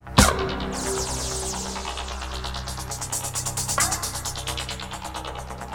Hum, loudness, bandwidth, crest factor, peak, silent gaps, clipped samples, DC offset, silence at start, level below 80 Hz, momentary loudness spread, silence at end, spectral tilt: none; -26 LUFS; 19 kHz; 26 dB; 0 dBFS; none; under 0.1%; under 0.1%; 0 s; -34 dBFS; 11 LU; 0 s; -3 dB/octave